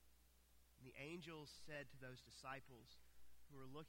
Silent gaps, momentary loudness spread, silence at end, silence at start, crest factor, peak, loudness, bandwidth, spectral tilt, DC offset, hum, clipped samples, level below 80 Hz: none; 12 LU; 0 s; 0 s; 18 dB; -40 dBFS; -58 LUFS; 16.5 kHz; -4.5 dB/octave; under 0.1%; none; under 0.1%; -76 dBFS